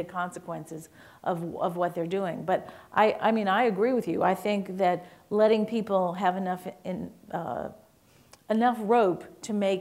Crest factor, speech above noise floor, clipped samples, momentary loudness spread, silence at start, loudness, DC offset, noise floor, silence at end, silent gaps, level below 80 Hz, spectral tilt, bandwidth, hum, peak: 20 dB; 32 dB; under 0.1%; 13 LU; 0 s; -28 LUFS; under 0.1%; -59 dBFS; 0 s; none; -68 dBFS; -6.5 dB/octave; 16 kHz; none; -8 dBFS